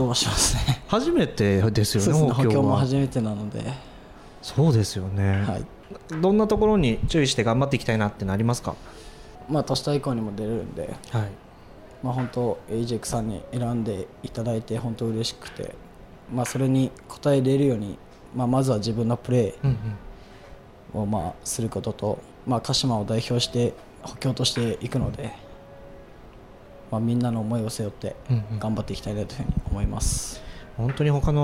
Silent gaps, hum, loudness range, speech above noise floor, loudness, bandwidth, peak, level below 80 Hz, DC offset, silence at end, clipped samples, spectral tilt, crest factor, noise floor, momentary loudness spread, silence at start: none; none; 7 LU; 22 dB; -25 LUFS; 16 kHz; -8 dBFS; -40 dBFS; under 0.1%; 0 s; under 0.1%; -5.5 dB/octave; 18 dB; -46 dBFS; 15 LU; 0 s